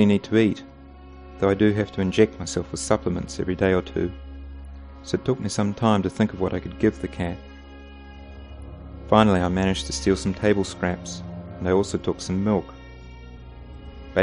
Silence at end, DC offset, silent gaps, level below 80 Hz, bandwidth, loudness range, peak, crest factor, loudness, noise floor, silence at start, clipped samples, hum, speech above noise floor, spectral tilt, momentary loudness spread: 0 s; under 0.1%; none; -42 dBFS; 10.5 kHz; 3 LU; -2 dBFS; 22 dB; -23 LUFS; -44 dBFS; 0 s; under 0.1%; none; 21 dB; -6 dB/octave; 23 LU